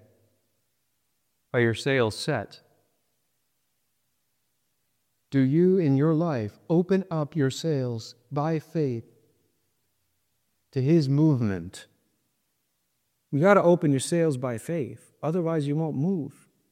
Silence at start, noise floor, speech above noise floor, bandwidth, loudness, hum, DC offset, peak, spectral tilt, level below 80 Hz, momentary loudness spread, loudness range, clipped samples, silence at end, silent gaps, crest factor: 1.55 s; -76 dBFS; 52 dB; 14.5 kHz; -25 LUFS; 60 Hz at -55 dBFS; under 0.1%; -6 dBFS; -7 dB/octave; -68 dBFS; 12 LU; 7 LU; under 0.1%; 0.4 s; none; 22 dB